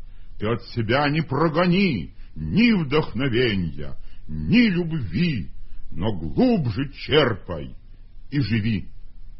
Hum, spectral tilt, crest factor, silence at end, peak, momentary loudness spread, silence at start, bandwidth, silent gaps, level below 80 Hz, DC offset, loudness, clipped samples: none; -10.5 dB/octave; 18 dB; 0 s; -4 dBFS; 15 LU; 0 s; 5.8 kHz; none; -40 dBFS; under 0.1%; -22 LUFS; under 0.1%